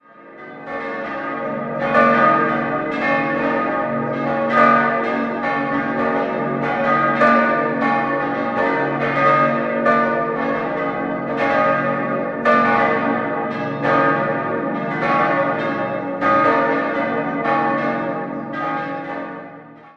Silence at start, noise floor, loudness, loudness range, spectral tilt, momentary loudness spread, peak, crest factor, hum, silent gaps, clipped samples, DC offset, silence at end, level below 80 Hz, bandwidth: 0.2 s; -39 dBFS; -18 LUFS; 2 LU; -7.5 dB/octave; 10 LU; -2 dBFS; 18 dB; none; none; under 0.1%; under 0.1%; 0.05 s; -56 dBFS; 7.4 kHz